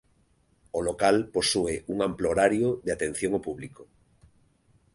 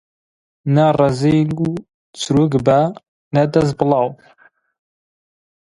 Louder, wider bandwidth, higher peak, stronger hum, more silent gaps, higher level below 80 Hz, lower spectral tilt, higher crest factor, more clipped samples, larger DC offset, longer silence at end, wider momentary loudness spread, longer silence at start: second, -26 LUFS vs -16 LUFS; about the same, 11.5 kHz vs 11.5 kHz; second, -8 dBFS vs 0 dBFS; neither; second, none vs 1.94-2.13 s, 3.08-3.31 s; about the same, -52 dBFS vs -48 dBFS; second, -4 dB/octave vs -7 dB/octave; about the same, 20 dB vs 18 dB; neither; neither; second, 1.1 s vs 1.65 s; about the same, 11 LU vs 9 LU; about the same, 0.75 s vs 0.65 s